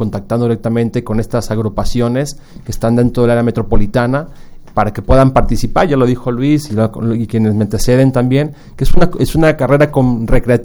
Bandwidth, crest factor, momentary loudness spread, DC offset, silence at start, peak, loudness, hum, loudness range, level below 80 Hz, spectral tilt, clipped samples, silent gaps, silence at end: 16.5 kHz; 12 dB; 8 LU; under 0.1%; 0 s; 0 dBFS; -14 LUFS; none; 3 LU; -20 dBFS; -7 dB/octave; 0.2%; none; 0 s